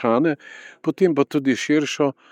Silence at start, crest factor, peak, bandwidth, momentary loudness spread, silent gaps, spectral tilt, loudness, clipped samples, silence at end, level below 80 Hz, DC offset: 0 s; 16 dB; -4 dBFS; 10.5 kHz; 9 LU; none; -5.5 dB/octave; -21 LUFS; under 0.1%; 0.2 s; -76 dBFS; under 0.1%